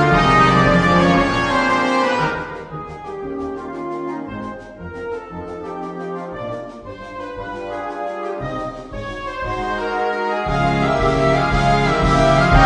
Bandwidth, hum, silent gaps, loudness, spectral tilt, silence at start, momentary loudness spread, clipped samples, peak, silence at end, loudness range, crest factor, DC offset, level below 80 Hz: 10.5 kHz; none; none; -18 LUFS; -6 dB/octave; 0 s; 17 LU; under 0.1%; 0 dBFS; 0 s; 12 LU; 18 dB; under 0.1%; -30 dBFS